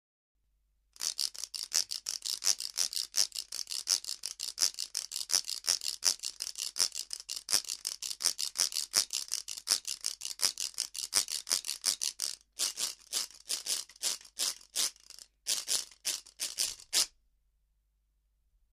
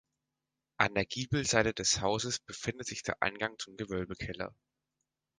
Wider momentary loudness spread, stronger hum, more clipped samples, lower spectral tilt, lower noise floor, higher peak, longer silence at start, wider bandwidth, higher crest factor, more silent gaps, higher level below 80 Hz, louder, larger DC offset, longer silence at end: second, 7 LU vs 11 LU; neither; neither; second, 3 dB/octave vs -3 dB/octave; second, -75 dBFS vs -88 dBFS; about the same, -6 dBFS vs -8 dBFS; first, 1 s vs 0.8 s; first, 15.5 kHz vs 10 kHz; about the same, 30 dB vs 26 dB; neither; second, -74 dBFS vs -56 dBFS; about the same, -32 LUFS vs -33 LUFS; neither; first, 1.65 s vs 0.9 s